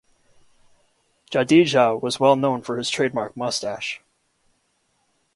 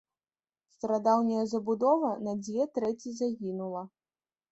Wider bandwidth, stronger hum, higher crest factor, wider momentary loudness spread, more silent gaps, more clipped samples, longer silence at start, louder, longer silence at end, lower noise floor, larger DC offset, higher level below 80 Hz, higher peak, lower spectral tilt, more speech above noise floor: first, 11.5 kHz vs 8.2 kHz; neither; about the same, 20 dB vs 18 dB; about the same, 12 LU vs 12 LU; neither; neither; first, 1.3 s vs 0.85 s; first, -21 LUFS vs -30 LUFS; first, 1.4 s vs 0.65 s; second, -68 dBFS vs under -90 dBFS; neither; first, -66 dBFS vs -76 dBFS; first, -2 dBFS vs -12 dBFS; second, -4.5 dB/octave vs -6.5 dB/octave; second, 48 dB vs over 61 dB